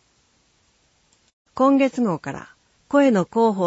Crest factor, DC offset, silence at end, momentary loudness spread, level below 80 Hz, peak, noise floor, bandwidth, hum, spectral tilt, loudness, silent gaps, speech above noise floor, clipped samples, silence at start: 16 dB; under 0.1%; 0 s; 17 LU; -64 dBFS; -6 dBFS; -63 dBFS; 8 kHz; none; -7 dB/octave; -20 LUFS; none; 44 dB; under 0.1%; 1.55 s